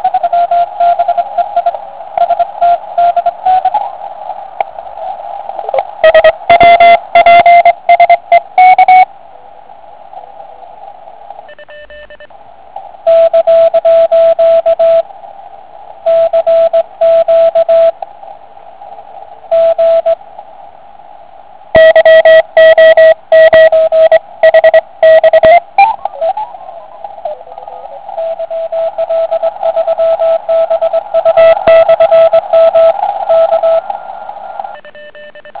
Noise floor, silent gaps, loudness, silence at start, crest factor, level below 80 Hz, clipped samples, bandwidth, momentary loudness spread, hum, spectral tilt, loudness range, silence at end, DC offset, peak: -36 dBFS; none; -7 LUFS; 0 s; 8 dB; -46 dBFS; 2%; 4 kHz; 19 LU; none; -6 dB/octave; 10 LU; 0 s; 1%; 0 dBFS